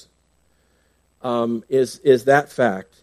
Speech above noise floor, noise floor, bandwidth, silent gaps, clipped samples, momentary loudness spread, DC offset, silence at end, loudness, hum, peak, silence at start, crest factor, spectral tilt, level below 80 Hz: 44 dB; -63 dBFS; 14 kHz; none; under 0.1%; 8 LU; under 0.1%; 0.2 s; -19 LUFS; 60 Hz at -45 dBFS; -2 dBFS; 1.25 s; 18 dB; -5.5 dB/octave; -64 dBFS